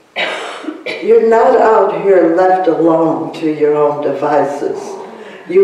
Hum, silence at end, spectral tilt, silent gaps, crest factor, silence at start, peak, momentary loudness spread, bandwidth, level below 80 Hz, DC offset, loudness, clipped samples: none; 0 s; -6 dB/octave; none; 12 dB; 0.15 s; 0 dBFS; 15 LU; 10.5 kHz; -60 dBFS; under 0.1%; -12 LUFS; under 0.1%